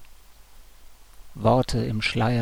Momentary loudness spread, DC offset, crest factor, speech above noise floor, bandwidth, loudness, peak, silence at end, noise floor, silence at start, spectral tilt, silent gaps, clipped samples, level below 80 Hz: 5 LU; 0.2%; 18 dB; 26 dB; 15.5 kHz; -23 LUFS; -8 dBFS; 0 s; -48 dBFS; 0 s; -6 dB/octave; none; under 0.1%; -42 dBFS